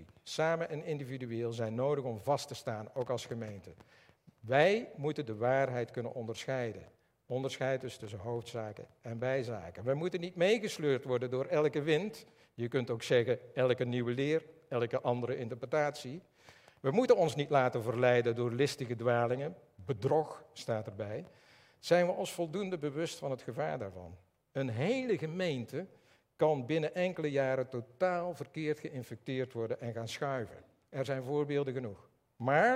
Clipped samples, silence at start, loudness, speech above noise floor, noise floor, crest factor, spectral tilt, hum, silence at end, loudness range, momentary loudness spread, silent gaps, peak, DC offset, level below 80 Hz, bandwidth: under 0.1%; 0 s; -34 LUFS; 27 dB; -61 dBFS; 22 dB; -6 dB/octave; none; 0 s; 6 LU; 13 LU; none; -12 dBFS; under 0.1%; -78 dBFS; 15.5 kHz